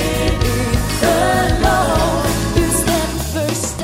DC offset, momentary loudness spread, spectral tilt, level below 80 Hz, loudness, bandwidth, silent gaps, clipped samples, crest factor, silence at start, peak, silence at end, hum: under 0.1%; 5 LU; -4.5 dB/octave; -24 dBFS; -16 LUFS; 16.5 kHz; none; under 0.1%; 16 dB; 0 s; 0 dBFS; 0 s; none